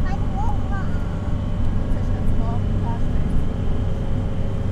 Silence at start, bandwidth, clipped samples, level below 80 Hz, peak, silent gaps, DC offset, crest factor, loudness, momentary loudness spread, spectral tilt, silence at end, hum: 0 s; 6.8 kHz; under 0.1%; -22 dBFS; -8 dBFS; none; under 0.1%; 12 dB; -25 LUFS; 2 LU; -8.5 dB/octave; 0 s; none